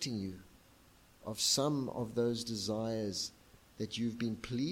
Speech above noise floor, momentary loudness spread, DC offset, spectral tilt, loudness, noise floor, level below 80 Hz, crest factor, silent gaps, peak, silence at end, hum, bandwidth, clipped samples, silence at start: 27 dB; 14 LU; under 0.1%; -4 dB/octave; -36 LUFS; -63 dBFS; -66 dBFS; 20 dB; none; -18 dBFS; 0 s; none; 16.5 kHz; under 0.1%; 0 s